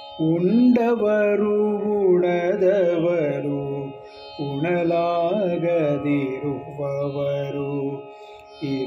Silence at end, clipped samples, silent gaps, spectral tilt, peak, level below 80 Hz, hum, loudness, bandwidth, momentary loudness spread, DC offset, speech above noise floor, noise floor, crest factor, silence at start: 0 s; under 0.1%; none; -9 dB/octave; -8 dBFS; -62 dBFS; none; -22 LUFS; 6.8 kHz; 12 LU; under 0.1%; 21 dB; -42 dBFS; 14 dB; 0 s